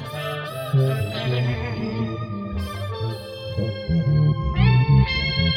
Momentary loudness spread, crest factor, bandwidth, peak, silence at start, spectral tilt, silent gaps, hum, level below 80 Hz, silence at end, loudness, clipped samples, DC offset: 11 LU; 16 dB; 14 kHz; -4 dBFS; 0 s; -7.5 dB/octave; none; none; -34 dBFS; 0 s; -23 LUFS; under 0.1%; under 0.1%